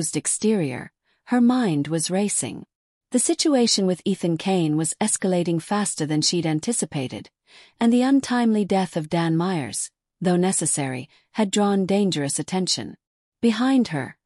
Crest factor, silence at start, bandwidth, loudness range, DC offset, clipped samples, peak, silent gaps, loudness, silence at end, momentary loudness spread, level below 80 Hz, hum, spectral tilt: 14 dB; 0 s; 13.5 kHz; 2 LU; under 0.1%; under 0.1%; -8 dBFS; 2.75-3.01 s, 13.07-13.32 s; -22 LUFS; 0.15 s; 9 LU; -66 dBFS; none; -4.5 dB/octave